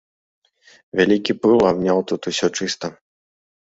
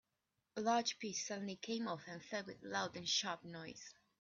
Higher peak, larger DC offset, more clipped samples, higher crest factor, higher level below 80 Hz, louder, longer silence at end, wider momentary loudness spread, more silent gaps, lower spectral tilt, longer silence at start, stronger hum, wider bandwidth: first, -2 dBFS vs -24 dBFS; neither; neither; about the same, 18 dB vs 20 dB; first, -56 dBFS vs -84 dBFS; first, -19 LUFS vs -42 LUFS; first, 0.85 s vs 0.3 s; second, 11 LU vs 14 LU; neither; first, -4.5 dB/octave vs -2.5 dB/octave; first, 0.95 s vs 0.55 s; neither; about the same, 8 kHz vs 7.8 kHz